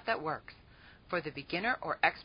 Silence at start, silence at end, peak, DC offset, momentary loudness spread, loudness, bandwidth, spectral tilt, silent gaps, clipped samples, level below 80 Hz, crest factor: 0 s; 0 s; -12 dBFS; under 0.1%; 10 LU; -35 LUFS; 5.2 kHz; -2 dB/octave; none; under 0.1%; -64 dBFS; 24 dB